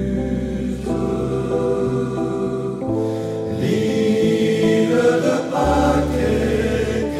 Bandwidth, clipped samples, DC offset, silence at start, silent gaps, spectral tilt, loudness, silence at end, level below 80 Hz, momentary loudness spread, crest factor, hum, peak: 15.5 kHz; under 0.1%; under 0.1%; 0 s; none; -6.5 dB/octave; -19 LUFS; 0 s; -34 dBFS; 7 LU; 14 dB; none; -6 dBFS